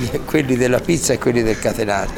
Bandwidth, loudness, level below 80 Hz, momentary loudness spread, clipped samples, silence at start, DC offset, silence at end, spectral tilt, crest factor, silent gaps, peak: 20 kHz; -18 LUFS; -34 dBFS; 3 LU; under 0.1%; 0 s; under 0.1%; 0 s; -5 dB/octave; 14 dB; none; -4 dBFS